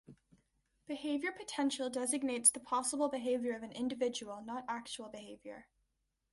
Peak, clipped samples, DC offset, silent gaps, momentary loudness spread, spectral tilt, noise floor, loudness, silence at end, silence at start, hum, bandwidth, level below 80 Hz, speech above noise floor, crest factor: -14 dBFS; under 0.1%; under 0.1%; none; 20 LU; -1.5 dB/octave; -83 dBFS; -36 LUFS; 0.7 s; 0.1 s; none; 12 kHz; -76 dBFS; 46 dB; 24 dB